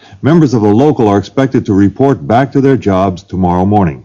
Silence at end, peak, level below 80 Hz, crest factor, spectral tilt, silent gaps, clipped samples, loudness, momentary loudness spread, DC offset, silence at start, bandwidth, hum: 0.05 s; 0 dBFS; -40 dBFS; 10 dB; -8.5 dB/octave; none; 2%; -10 LUFS; 4 LU; under 0.1%; 0.1 s; 7.4 kHz; none